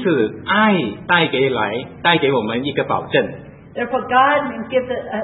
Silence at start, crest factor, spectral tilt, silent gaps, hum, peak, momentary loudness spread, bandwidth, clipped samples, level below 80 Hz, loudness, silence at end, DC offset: 0 s; 18 dB; -9 dB/octave; none; none; 0 dBFS; 9 LU; 4.1 kHz; under 0.1%; -54 dBFS; -18 LUFS; 0 s; under 0.1%